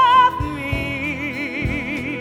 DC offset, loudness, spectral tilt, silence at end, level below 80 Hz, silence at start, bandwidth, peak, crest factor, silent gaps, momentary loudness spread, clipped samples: under 0.1%; -20 LUFS; -5.5 dB/octave; 0 s; -36 dBFS; 0 s; 14.5 kHz; -4 dBFS; 16 dB; none; 10 LU; under 0.1%